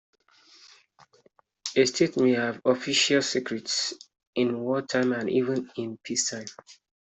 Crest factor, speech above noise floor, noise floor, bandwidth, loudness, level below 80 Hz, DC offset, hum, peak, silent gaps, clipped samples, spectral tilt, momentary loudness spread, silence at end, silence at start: 20 dB; 37 dB; -63 dBFS; 8.4 kHz; -26 LUFS; -70 dBFS; under 0.1%; none; -8 dBFS; 4.27-4.33 s; under 0.1%; -3 dB/octave; 13 LU; 0.3 s; 1.65 s